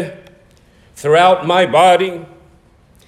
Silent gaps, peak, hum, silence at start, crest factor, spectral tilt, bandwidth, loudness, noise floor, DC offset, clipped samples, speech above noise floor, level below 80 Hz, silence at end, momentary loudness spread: none; 0 dBFS; none; 0 s; 14 dB; -4.5 dB/octave; 14.5 kHz; -12 LUFS; -49 dBFS; under 0.1%; under 0.1%; 37 dB; -54 dBFS; 0.85 s; 16 LU